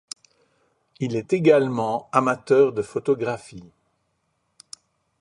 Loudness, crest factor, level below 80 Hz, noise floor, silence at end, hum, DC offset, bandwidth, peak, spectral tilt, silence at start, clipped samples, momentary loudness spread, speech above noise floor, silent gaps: -21 LUFS; 22 dB; -64 dBFS; -72 dBFS; 1.6 s; none; under 0.1%; 11 kHz; -2 dBFS; -6.5 dB/octave; 1 s; under 0.1%; 25 LU; 51 dB; none